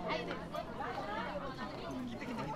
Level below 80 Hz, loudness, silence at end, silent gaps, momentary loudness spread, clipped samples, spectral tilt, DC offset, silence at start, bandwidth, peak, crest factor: -58 dBFS; -41 LUFS; 0 s; none; 4 LU; under 0.1%; -5.5 dB/octave; under 0.1%; 0 s; 16 kHz; -24 dBFS; 16 dB